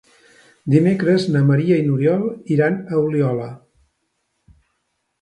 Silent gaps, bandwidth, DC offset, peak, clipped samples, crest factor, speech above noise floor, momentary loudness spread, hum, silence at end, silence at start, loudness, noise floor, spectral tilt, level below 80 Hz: none; 9.8 kHz; under 0.1%; 0 dBFS; under 0.1%; 18 dB; 55 dB; 6 LU; none; 1.65 s; 0.65 s; -18 LUFS; -72 dBFS; -8.5 dB/octave; -60 dBFS